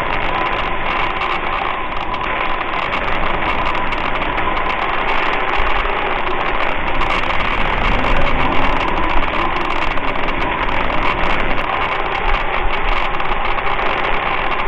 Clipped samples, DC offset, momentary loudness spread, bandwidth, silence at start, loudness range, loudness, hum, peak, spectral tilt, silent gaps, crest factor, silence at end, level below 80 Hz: under 0.1%; under 0.1%; 2 LU; 6 kHz; 0 s; 2 LU; -18 LUFS; none; 0 dBFS; -5.5 dB/octave; none; 16 dB; 0 s; -22 dBFS